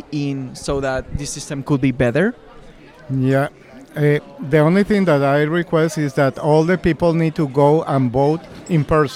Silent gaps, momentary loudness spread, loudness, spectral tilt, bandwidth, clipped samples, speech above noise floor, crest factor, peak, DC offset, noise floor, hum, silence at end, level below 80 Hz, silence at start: none; 10 LU; -18 LUFS; -7 dB/octave; 14.5 kHz; under 0.1%; 24 dB; 16 dB; -2 dBFS; under 0.1%; -41 dBFS; none; 0 s; -40 dBFS; 0.1 s